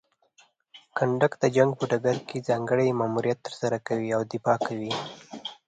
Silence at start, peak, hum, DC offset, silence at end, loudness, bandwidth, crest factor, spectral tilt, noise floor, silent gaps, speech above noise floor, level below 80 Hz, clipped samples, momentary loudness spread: 0.75 s; -6 dBFS; none; under 0.1%; 0.15 s; -26 LUFS; 9.2 kHz; 22 dB; -6 dB/octave; -62 dBFS; none; 37 dB; -68 dBFS; under 0.1%; 9 LU